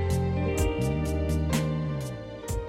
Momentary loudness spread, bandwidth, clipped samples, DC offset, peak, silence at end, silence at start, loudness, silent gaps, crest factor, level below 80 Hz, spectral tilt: 8 LU; 16.5 kHz; under 0.1%; under 0.1%; -12 dBFS; 0 s; 0 s; -29 LUFS; none; 14 dB; -34 dBFS; -6.5 dB/octave